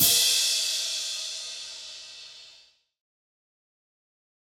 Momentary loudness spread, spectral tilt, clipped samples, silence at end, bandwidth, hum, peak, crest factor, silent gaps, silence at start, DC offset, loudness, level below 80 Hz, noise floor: 22 LU; 1 dB/octave; under 0.1%; 1.9 s; over 20 kHz; none; -8 dBFS; 22 dB; none; 0 s; under 0.1%; -24 LUFS; -70 dBFS; -58 dBFS